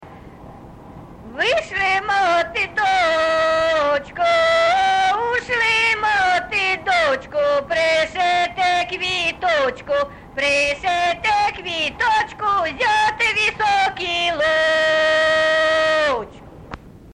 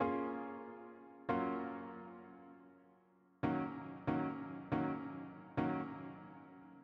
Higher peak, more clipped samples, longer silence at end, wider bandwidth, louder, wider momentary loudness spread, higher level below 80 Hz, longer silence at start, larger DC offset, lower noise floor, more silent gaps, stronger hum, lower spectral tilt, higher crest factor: first, -8 dBFS vs -24 dBFS; neither; about the same, 0 s vs 0 s; first, 11.5 kHz vs 5.4 kHz; first, -18 LUFS vs -42 LUFS; second, 6 LU vs 17 LU; first, -48 dBFS vs -70 dBFS; about the same, 0 s vs 0 s; neither; second, -39 dBFS vs -70 dBFS; neither; neither; second, -2.5 dB/octave vs -9.5 dB/octave; second, 12 dB vs 18 dB